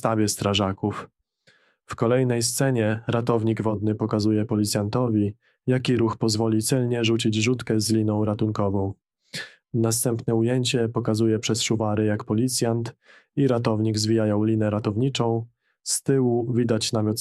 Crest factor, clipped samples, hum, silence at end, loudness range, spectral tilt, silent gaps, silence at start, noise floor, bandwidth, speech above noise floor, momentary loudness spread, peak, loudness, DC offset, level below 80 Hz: 16 dB; under 0.1%; none; 0 s; 2 LU; -5.5 dB/octave; none; 0.05 s; -62 dBFS; 14 kHz; 39 dB; 7 LU; -6 dBFS; -23 LUFS; under 0.1%; -60 dBFS